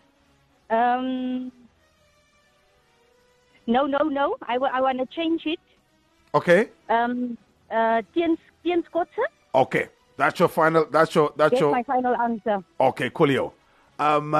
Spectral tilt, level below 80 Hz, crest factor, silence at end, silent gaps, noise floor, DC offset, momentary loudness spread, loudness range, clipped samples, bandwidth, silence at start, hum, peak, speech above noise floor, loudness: -6.5 dB/octave; -64 dBFS; 18 dB; 0 s; none; -62 dBFS; under 0.1%; 9 LU; 8 LU; under 0.1%; 13 kHz; 0.7 s; none; -6 dBFS; 40 dB; -23 LUFS